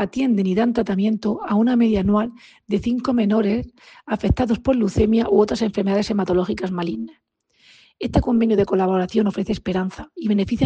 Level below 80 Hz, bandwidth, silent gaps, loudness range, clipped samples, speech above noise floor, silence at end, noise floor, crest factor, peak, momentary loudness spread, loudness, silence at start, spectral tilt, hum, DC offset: -38 dBFS; 8.4 kHz; none; 2 LU; under 0.1%; 35 dB; 0 s; -54 dBFS; 16 dB; -4 dBFS; 8 LU; -20 LUFS; 0 s; -7.5 dB/octave; none; under 0.1%